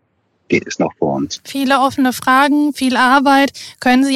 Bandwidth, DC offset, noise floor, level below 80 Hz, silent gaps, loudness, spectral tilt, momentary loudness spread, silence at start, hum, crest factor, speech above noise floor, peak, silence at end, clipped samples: 15 kHz; under 0.1%; -62 dBFS; -54 dBFS; none; -14 LUFS; -4 dB/octave; 9 LU; 0.5 s; none; 14 dB; 48 dB; 0 dBFS; 0 s; under 0.1%